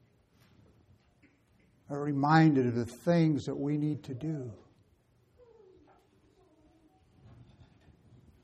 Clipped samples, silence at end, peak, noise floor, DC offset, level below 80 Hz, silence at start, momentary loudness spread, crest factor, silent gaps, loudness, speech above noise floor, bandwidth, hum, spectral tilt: under 0.1%; 3.9 s; -10 dBFS; -68 dBFS; under 0.1%; -68 dBFS; 1.9 s; 15 LU; 24 dB; none; -30 LUFS; 39 dB; 10.5 kHz; none; -8 dB/octave